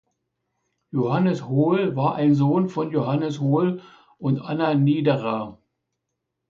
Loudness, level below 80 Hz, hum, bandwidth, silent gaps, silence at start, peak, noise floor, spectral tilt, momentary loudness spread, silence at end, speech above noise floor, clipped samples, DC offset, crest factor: -22 LUFS; -64 dBFS; none; 7.2 kHz; none; 0.95 s; -8 dBFS; -80 dBFS; -9 dB/octave; 9 LU; 0.95 s; 59 dB; under 0.1%; under 0.1%; 16 dB